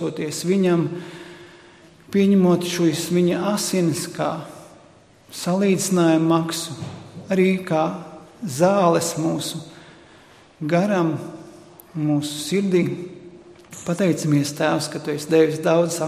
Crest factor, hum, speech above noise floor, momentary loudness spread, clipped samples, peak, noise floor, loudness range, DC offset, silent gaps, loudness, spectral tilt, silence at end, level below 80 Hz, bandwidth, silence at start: 18 dB; none; 31 dB; 18 LU; under 0.1%; -4 dBFS; -51 dBFS; 3 LU; under 0.1%; none; -21 LUFS; -5.5 dB/octave; 0 s; -62 dBFS; 15.5 kHz; 0 s